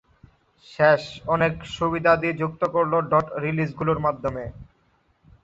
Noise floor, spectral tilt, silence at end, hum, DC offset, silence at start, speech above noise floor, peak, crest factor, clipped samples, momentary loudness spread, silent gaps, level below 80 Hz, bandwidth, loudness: -64 dBFS; -7 dB/octave; 0.8 s; none; under 0.1%; 0.7 s; 42 dB; -4 dBFS; 20 dB; under 0.1%; 8 LU; none; -50 dBFS; 7.8 kHz; -23 LUFS